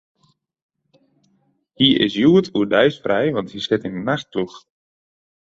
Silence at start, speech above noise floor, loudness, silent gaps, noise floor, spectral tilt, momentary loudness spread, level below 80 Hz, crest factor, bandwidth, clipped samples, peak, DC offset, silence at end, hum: 1.8 s; 46 dB; -18 LUFS; none; -64 dBFS; -6.5 dB/octave; 10 LU; -58 dBFS; 20 dB; 7.8 kHz; under 0.1%; -2 dBFS; under 0.1%; 1 s; none